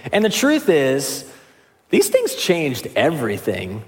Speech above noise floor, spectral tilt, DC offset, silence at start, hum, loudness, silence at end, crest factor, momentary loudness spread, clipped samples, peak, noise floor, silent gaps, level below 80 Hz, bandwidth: 34 dB; -4 dB/octave; under 0.1%; 0.05 s; none; -18 LUFS; 0.05 s; 16 dB; 8 LU; under 0.1%; -2 dBFS; -53 dBFS; none; -60 dBFS; 17 kHz